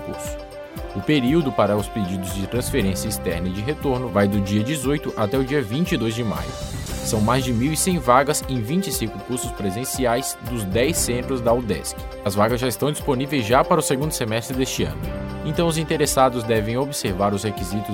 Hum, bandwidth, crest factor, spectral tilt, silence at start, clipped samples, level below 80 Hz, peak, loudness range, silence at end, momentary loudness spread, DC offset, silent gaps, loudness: none; 16.5 kHz; 20 dB; -5 dB/octave; 0 s; under 0.1%; -36 dBFS; 0 dBFS; 2 LU; 0 s; 9 LU; under 0.1%; none; -22 LUFS